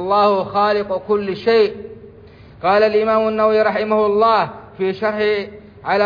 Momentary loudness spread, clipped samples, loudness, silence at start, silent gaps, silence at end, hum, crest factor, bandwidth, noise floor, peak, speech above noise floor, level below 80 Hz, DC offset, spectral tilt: 9 LU; under 0.1%; -17 LUFS; 0 s; none; 0 s; none; 12 dB; 5.2 kHz; -42 dBFS; -4 dBFS; 26 dB; -52 dBFS; under 0.1%; -7 dB/octave